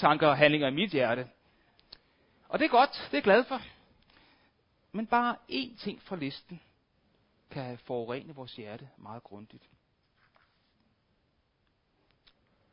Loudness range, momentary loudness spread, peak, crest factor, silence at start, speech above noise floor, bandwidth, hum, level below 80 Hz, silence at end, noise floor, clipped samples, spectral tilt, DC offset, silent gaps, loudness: 15 LU; 23 LU; -6 dBFS; 26 dB; 0 s; 45 dB; 5.4 kHz; none; -70 dBFS; 3.25 s; -74 dBFS; under 0.1%; -3 dB/octave; under 0.1%; none; -29 LUFS